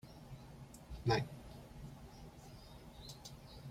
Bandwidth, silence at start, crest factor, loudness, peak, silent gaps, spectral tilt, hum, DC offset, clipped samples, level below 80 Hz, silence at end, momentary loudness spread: 16 kHz; 0.05 s; 24 dB; -45 LUFS; -22 dBFS; none; -5.5 dB/octave; none; under 0.1%; under 0.1%; -58 dBFS; 0 s; 19 LU